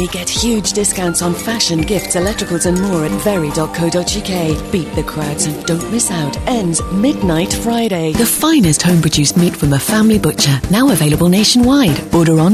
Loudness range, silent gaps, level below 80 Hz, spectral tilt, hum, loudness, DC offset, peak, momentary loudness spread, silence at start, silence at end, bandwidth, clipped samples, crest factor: 5 LU; none; -32 dBFS; -4.5 dB/octave; none; -13 LUFS; under 0.1%; -2 dBFS; 6 LU; 0 s; 0 s; 14 kHz; under 0.1%; 12 dB